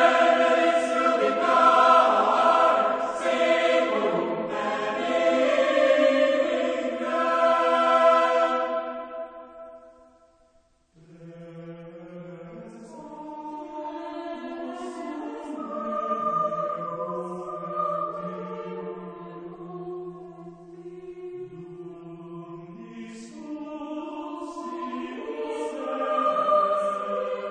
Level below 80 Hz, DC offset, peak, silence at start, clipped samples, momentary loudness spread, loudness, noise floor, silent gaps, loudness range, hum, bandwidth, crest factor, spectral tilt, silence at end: -68 dBFS; under 0.1%; -6 dBFS; 0 s; under 0.1%; 23 LU; -24 LUFS; -63 dBFS; none; 20 LU; none; 9.6 kHz; 20 dB; -4.5 dB/octave; 0 s